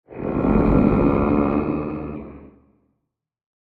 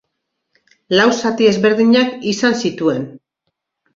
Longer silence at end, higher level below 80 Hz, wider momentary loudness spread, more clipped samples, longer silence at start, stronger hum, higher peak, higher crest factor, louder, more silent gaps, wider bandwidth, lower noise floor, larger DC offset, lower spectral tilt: first, 1.3 s vs 0.8 s; first, -32 dBFS vs -58 dBFS; first, 16 LU vs 7 LU; neither; second, 0.1 s vs 0.9 s; neither; about the same, -4 dBFS vs -2 dBFS; about the same, 18 dB vs 14 dB; second, -20 LUFS vs -15 LUFS; neither; second, 4.7 kHz vs 7.8 kHz; about the same, -77 dBFS vs -74 dBFS; neither; first, -11.5 dB/octave vs -4.5 dB/octave